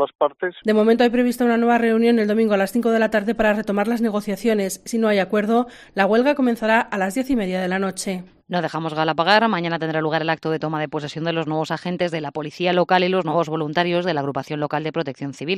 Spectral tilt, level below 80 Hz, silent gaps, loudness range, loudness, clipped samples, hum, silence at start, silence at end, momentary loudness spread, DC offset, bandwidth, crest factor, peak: -5.5 dB/octave; -54 dBFS; 0.15-0.19 s; 4 LU; -20 LUFS; under 0.1%; none; 0 s; 0 s; 9 LU; under 0.1%; 14 kHz; 18 dB; -2 dBFS